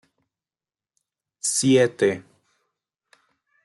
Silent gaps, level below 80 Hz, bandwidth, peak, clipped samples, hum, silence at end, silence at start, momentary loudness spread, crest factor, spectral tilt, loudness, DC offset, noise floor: none; -74 dBFS; 12.5 kHz; -6 dBFS; under 0.1%; none; 1.45 s; 1.45 s; 10 LU; 20 dB; -4 dB/octave; -21 LUFS; under 0.1%; under -90 dBFS